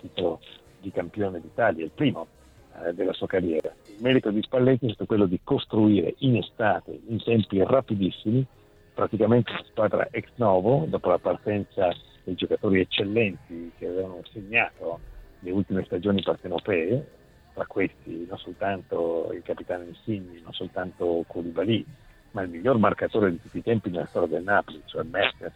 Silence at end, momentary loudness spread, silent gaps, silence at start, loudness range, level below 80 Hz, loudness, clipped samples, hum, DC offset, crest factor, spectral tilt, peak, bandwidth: 0.05 s; 14 LU; none; 0.05 s; 6 LU; -56 dBFS; -26 LUFS; under 0.1%; none; under 0.1%; 20 dB; -8.5 dB/octave; -6 dBFS; 8.6 kHz